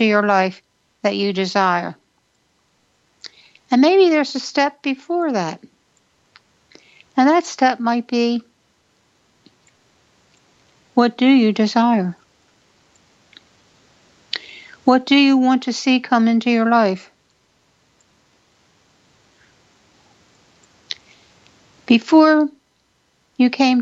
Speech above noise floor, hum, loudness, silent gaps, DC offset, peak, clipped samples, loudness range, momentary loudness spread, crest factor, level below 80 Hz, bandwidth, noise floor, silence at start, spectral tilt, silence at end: 48 dB; none; -17 LUFS; none; under 0.1%; 0 dBFS; under 0.1%; 7 LU; 16 LU; 18 dB; -70 dBFS; 7.8 kHz; -64 dBFS; 0 s; -5 dB/octave; 0 s